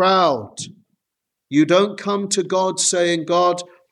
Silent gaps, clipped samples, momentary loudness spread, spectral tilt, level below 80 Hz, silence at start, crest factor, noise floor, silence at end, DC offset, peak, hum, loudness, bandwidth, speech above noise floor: none; under 0.1%; 12 LU; -3.5 dB/octave; -70 dBFS; 0 s; 16 dB; -81 dBFS; 0.25 s; under 0.1%; -4 dBFS; none; -18 LUFS; 12.5 kHz; 63 dB